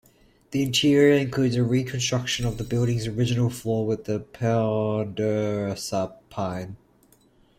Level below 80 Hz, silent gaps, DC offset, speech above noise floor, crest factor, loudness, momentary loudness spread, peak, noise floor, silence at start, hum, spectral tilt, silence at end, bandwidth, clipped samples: -50 dBFS; none; under 0.1%; 35 dB; 18 dB; -24 LUFS; 11 LU; -8 dBFS; -59 dBFS; 0.5 s; none; -5.5 dB/octave; 0.85 s; 16 kHz; under 0.1%